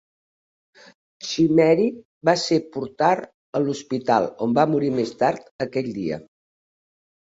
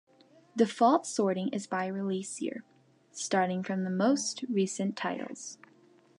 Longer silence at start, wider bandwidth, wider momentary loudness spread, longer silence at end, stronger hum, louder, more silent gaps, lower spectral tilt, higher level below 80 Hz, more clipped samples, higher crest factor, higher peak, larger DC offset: first, 1.2 s vs 0.55 s; second, 8 kHz vs 11.5 kHz; second, 11 LU vs 15 LU; first, 1.15 s vs 0.65 s; neither; first, -22 LUFS vs -31 LUFS; first, 2.05-2.21 s, 3.34-3.53 s, 5.51-5.59 s vs none; about the same, -5.5 dB/octave vs -4.5 dB/octave; first, -64 dBFS vs -84 dBFS; neither; about the same, 20 dB vs 20 dB; first, -2 dBFS vs -12 dBFS; neither